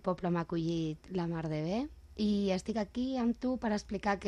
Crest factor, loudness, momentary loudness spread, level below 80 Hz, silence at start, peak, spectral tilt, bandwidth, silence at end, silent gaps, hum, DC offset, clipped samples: 14 dB; -35 LUFS; 5 LU; -56 dBFS; 0.05 s; -20 dBFS; -7 dB/octave; 10.5 kHz; 0 s; none; none; under 0.1%; under 0.1%